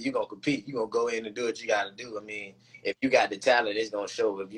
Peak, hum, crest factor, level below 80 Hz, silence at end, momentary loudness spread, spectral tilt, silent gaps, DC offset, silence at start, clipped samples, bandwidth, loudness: -8 dBFS; none; 22 dB; -68 dBFS; 0 s; 13 LU; -3.5 dB/octave; none; under 0.1%; 0 s; under 0.1%; 11 kHz; -29 LUFS